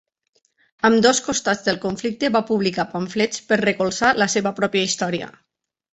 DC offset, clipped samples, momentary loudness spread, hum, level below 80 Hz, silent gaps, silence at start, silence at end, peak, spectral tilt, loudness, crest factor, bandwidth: under 0.1%; under 0.1%; 8 LU; none; -58 dBFS; none; 0.85 s; 0.65 s; -2 dBFS; -3.5 dB/octave; -20 LUFS; 18 dB; 8.2 kHz